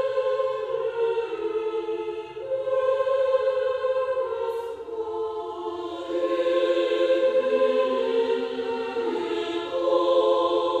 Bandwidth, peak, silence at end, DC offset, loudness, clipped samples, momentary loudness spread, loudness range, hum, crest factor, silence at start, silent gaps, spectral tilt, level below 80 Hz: 8.6 kHz; -10 dBFS; 0 s; under 0.1%; -25 LUFS; under 0.1%; 10 LU; 3 LU; none; 14 dB; 0 s; none; -4.5 dB/octave; -66 dBFS